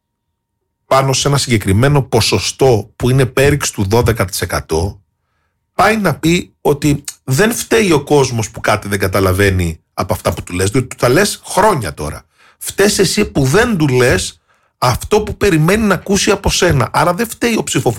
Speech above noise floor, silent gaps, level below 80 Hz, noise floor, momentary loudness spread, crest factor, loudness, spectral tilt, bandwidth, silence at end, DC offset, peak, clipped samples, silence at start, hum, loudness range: 59 dB; none; -32 dBFS; -72 dBFS; 7 LU; 12 dB; -14 LUFS; -4.5 dB/octave; 17 kHz; 0 s; under 0.1%; -2 dBFS; under 0.1%; 0.9 s; none; 3 LU